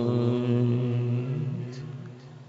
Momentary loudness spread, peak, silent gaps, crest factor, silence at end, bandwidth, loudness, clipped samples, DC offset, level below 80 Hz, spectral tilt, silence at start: 15 LU; -12 dBFS; none; 14 dB; 0 s; 7 kHz; -27 LUFS; under 0.1%; under 0.1%; -66 dBFS; -9.5 dB/octave; 0 s